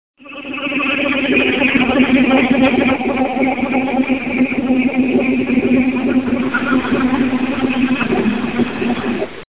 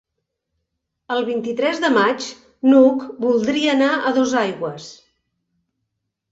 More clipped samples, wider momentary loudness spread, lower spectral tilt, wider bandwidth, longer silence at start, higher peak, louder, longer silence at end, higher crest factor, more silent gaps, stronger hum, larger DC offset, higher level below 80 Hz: neither; second, 6 LU vs 14 LU; first, -9.5 dB/octave vs -4.5 dB/octave; second, 4 kHz vs 8 kHz; second, 0.2 s vs 1.1 s; about the same, 0 dBFS vs -2 dBFS; first, -15 LUFS vs -18 LUFS; second, 0.1 s vs 1.4 s; about the same, 14 dB vs 18 dB; neither; neither; first, 0.7% vs under 0.1%; first, -42 dBFS vs -64 dBFS